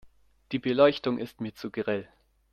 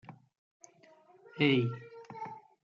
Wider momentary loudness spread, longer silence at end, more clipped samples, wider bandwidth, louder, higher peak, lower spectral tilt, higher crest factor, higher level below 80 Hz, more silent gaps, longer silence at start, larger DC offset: second, 13 LU vs 21 LU; first, 0.5 s vs 0.25 s; neither; first, 13.5 kHz vs 7.4 kHz; first, -28 LUFS vs -31 LUFS; first, -8 dBFS vs -14 dBFS; about the same, -7 dB/octave vs -6.5 dB/octave; about the same, 20 dB vs 22 dB; first, -64 dBFS vs -80 dBFS; second, none vs 0.38-0.60 s; about the same, 0.05 s vs 0.1 s; neither